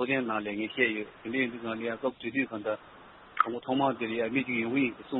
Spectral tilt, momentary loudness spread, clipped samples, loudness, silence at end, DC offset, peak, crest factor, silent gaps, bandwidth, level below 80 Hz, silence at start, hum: -3 dB/octave; 7 LU; under 0.1%; -31 LUFS; 0 s; under 0.1%; -6 dBFS; 24 dB; none; 4 kHz; -70 dBFS; 0 s; none